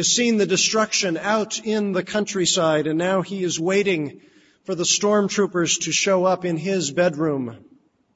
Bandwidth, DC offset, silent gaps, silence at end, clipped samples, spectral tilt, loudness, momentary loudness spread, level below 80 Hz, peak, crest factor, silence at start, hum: 8 kHz; under 0.1%; none; 0.6 s; under 0.1%; -3 dB/octave; -20 LUFS; 6 LU; -64 dBFS; -6 dBFS; 16 dB; 0 s; none